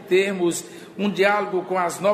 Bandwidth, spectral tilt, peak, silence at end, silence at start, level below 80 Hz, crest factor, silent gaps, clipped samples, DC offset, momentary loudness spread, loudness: 15 kHz; -4.5 dB/octave; -4 dBFS; 0 s; 0 s; -70 dBFS; 18 dB; none; under 0.1%; under 0.1%; 9 LU; -22 LUFS